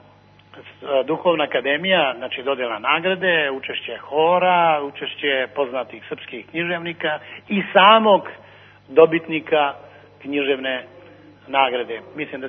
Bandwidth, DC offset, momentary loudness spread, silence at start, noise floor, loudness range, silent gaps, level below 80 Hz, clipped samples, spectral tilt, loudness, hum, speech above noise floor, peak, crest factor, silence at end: 4.2 kHz; under 0.1%; 14 LU; 0.55 s; -50 dBFS; 4 LU; none; -70 dBFS; under 0.1%; -7.5 dB/octave; -19 LUFS; none; 31 dB; 0 dBFS; 20 dB; 0 s